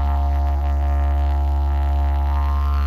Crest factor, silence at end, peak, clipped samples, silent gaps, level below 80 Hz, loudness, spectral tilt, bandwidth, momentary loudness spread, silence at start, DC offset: 8 dB; 0 s; -10 dBFS; under 0.1%; none; -20 dBFS; -21 LUFS; -8.5 dB/octave; 4.6 kHz; 1 LU; 0 s; under 0.1%